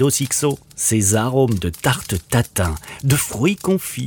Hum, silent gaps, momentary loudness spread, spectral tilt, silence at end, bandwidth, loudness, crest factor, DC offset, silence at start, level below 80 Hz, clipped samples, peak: none; none; 6 LU; -4.5 dB/octave; 0 s; over 20 kHz; -19 LUFS; 16 dB; under 0.1%; 0 s; -38 dBFS; under 0.1%; -4 dBFS